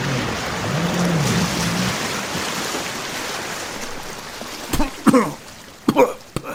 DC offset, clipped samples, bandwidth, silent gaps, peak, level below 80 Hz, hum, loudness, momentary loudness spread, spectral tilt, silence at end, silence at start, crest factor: under 0.1%; under 0.1%; 17 kHz; none; 0 dBFS; -38 dBFS; none; -21 LUFS; 13 LU; -4.5 dB/octave; 0 s; 0 s; 22 dB